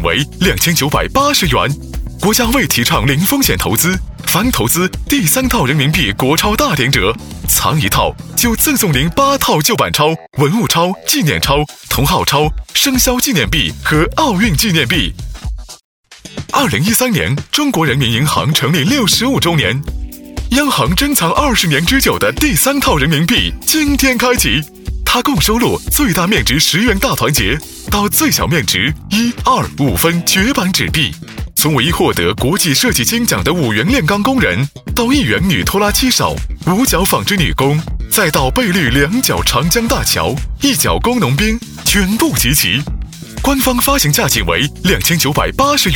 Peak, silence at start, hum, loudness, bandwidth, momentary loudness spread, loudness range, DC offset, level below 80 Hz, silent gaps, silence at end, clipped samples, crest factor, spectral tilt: 0 dBFS; 0 s; none; -12 LUFS; over 20 kHz; 5 LU; 1 LU; under 0.1%; -26 dBFS; 15.85-16.04 s; 0 s; under 0.1%; 14 dB; -3.5 dB/octave